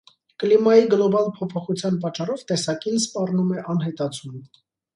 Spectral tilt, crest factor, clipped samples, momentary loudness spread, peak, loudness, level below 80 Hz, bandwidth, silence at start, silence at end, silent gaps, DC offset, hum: -5.5 dB/octave; 18 dB; under 0.1%; 13 LU; -4 dBFS; -22 LUFS; -68 dBFS; 11.5 kHz; 0.4 s; 0.5 s; none; under 0.1%; none